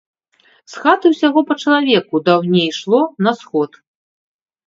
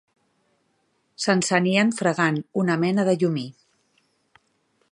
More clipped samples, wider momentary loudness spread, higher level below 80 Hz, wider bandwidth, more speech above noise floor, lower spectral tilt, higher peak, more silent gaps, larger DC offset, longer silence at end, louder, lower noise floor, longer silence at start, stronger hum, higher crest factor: neither; about the same, 8 LU vs 7 LU; about the same, -68 dBFS vs -70 dBFS; second, 7.8 kHz vs 11 kHz; second, 40 dB vs 48 dB; about the same, -6 dB/octave vs -5 dB/octave; about the same, 0 dBFS vs -2 dBFS; neither; neither; second, 1 s vs 1.4 s; first, -15 LUFS vs -22 LUFS; second, -55 dBFS vs -69 dBFS; second, 0.7 s vs 1.2 s; neither; second, 16 dB vs 22 dB